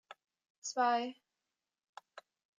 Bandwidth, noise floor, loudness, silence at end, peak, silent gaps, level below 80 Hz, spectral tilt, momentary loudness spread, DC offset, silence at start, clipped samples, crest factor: 9.4 kHz; under -90 dBFS; -35 LUFS; 0.4 s; -22 dBFS; 0.50-0.62 s, 1.89-1.93 s; under -90 dBFS; -1 dB/octave; 26 LU; under 0.1%; 0.1 s; under 0.1%; 18 dB